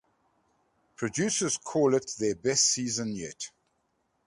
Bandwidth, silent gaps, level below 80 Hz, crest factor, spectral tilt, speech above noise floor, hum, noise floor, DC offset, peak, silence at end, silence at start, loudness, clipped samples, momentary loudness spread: 11.5 kHz; none; -68 dBFS; 20 dB; -3 dB/octave; 46 dB; none; -75 dBFS; under 0.1%; -10 dBFS; 0.8 s; 1 s; -27 LUFS; under 0.1%; 14 LU